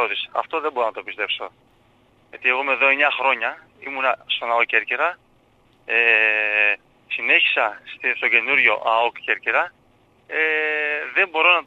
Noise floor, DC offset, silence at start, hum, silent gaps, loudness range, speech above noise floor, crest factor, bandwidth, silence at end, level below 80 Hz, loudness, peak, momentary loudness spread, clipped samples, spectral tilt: -58 dBFS; under 0.1%; 0 s; none; none; 4 LU; 37 dB; 20 dB; 8 kHz; 0.05 s; -68 dBFS; -19 LUFS; -2 dBFS; 12 LU; under 0.1%; -3 dB/octave